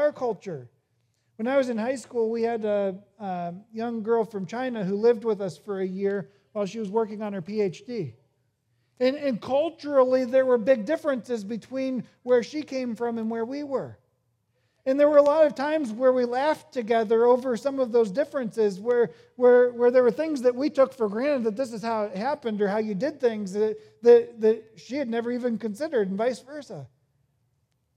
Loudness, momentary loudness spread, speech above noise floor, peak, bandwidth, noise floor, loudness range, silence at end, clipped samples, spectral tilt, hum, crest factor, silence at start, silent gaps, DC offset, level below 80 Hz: -25 LUFS; 13 LU; 48 dB; -6 dBFS; 10.5 kHz; -72 dBFS; 7 LU; 1.1 s; under 0.1%; -6.5 dB/octave; none; 20 dB; 0 s; none; under 0.1%; -78 dBFS